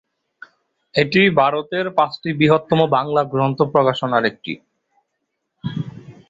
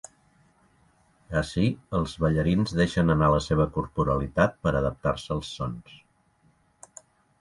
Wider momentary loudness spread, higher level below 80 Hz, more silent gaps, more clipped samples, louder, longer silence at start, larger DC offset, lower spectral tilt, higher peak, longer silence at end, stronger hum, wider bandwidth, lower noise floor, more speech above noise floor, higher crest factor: first, 15 LU vs 9 LU; second, -56 dBFS vs -42 dBFS; neither; neither; first, -18 LUFS vs -26 LUFS; second, 0.95 s vs 1.3 s; neither; about the same, -7.5 dB/octave vs -7 dB/octave; first, -2 dBFS vs -6 dBFS; second, 0.2 s vs 1.45 s; neither; second, 7.8 kHz vs 11.5 kHz; first, -75 dBFS vs -64 dBFS; first, 58 dB vs 39 dB; about the same, 18 dB vs 22 dB